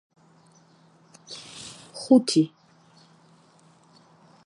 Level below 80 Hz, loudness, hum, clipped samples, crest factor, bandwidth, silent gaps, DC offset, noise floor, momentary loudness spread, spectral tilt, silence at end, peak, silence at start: -76 dBFS; -22 LUFS; none; under 0.1%; 22 dB; 11.5 kHz; none; under 0.1%; -58 dBFS; 22 LU; -5 dB/octave; 2 s; -6 dBFS; 1.3 s